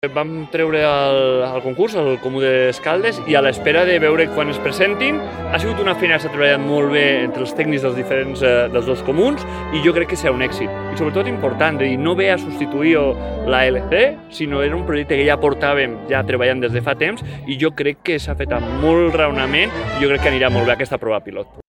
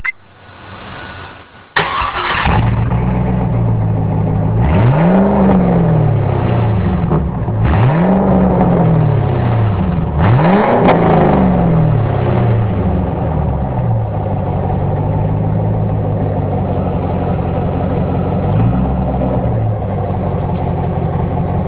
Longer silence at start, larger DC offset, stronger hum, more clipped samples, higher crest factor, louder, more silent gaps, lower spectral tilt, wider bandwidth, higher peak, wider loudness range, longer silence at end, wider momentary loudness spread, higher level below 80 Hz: about the same, 0.05 s vs 0 s; neither; neither; neither; first, 18 dB vs 12 dB; second, -17 LUFS vs -14 LUFS; neither; second, -6 dB/octave vs -12 dB/octave; first, 14 kHz vs 4 kHz; about the same, 0 dBFS vs 0 dBFS; about the same, 2 LU vs 4 LU; about the same, 0.1 s vs 0 s; about the same, 7 LU vs 7 LU; second, -36 dBFS vs -24 dBFS